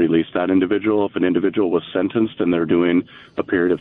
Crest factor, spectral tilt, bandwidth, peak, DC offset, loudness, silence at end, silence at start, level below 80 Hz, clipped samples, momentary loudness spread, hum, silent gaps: 12 dB; -10 dB/octave; 4 kHz; -6 dBFS; under 0.1%; -19 LUFS; 0 s; 0 s; -54 dBFS; under 0.1%; 4 LU; none; none